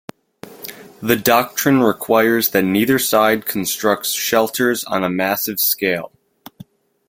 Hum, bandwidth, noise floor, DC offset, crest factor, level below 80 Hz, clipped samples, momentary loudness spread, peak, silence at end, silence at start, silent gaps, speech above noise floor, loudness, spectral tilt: none; 17 kHz; -43 dBFS; under 0.1%; 18 dB; -56 dBFS; under 0.1%; 11 LU; 0 dBFS; 1 s; 0.45 s; none; 27 dB; -16 LUFS; -3.5 dB/octave